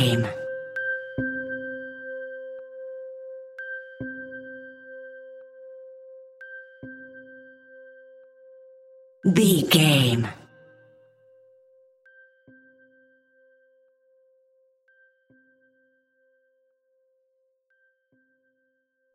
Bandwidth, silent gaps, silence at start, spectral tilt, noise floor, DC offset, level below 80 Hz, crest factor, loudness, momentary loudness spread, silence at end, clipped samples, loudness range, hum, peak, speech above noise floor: 16 kHz; none; 0 s; -5 dB/octave; -73 dBFS; under 0.1%; -66 dBFS; 26 dB; -25 LUFS; 28 LU; 8.75 s; under 0.1%; 22 LU; none; -4 dBFS; 53 dB